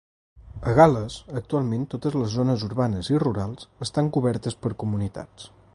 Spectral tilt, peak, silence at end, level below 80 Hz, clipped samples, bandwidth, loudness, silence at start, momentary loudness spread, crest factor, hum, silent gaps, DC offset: -7 dB/octave; -2 dBFS; 0.3 s; -46 dBFS; under 0.1%; 11.5 kHz; -24 LUFS; 0.35 s; 16 LU; 22 dB; none; none; under 0.1%